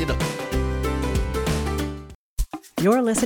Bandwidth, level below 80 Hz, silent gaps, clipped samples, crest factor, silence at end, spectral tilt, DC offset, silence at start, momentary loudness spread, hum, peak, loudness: 19.5 kHz; -30 dBFS; 2.15-2.37 s; under 0.1%; 16 dB; 0 s; -5.5 dB/octave; under 0.1%; 0 s; 13 LU; none; -8 dBFS; -25 LUFS